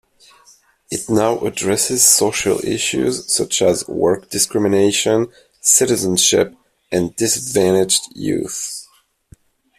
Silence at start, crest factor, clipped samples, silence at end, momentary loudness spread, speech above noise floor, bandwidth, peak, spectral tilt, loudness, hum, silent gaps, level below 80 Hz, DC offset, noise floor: 0.9 s; 18 dB; under 0.1%; 0.95 s; 11 LU; 35 dB; 16 kHz; 0 dBFS; -3 dB/octave; -16 LUFS; none; none; -52 dBFS; under 0.1%; -52 dBFS